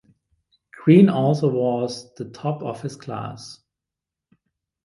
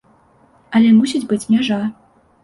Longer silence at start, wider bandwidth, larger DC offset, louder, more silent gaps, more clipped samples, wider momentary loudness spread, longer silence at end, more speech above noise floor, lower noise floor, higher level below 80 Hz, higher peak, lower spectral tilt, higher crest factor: about the same, 0.8 s vs 0.7 s; about the same, 11.5 kHz vs 11.5 kHz; neither; second, -20 LUFS vs -16 LUFS; neither; neither; first, 20 LU vs 9 LU; first, 1.3 s vs 0.5 s; first, 67 dB vs 38 dB; first, -87 dBFS vs -53 dBFS; second, -64 dBFS vs -58 dBFS; about the same, -2 dBFS vs -4 dBFS; first, -8 dB/octave vs -5.5 dB/octave; first, 20 dB vs 14 dB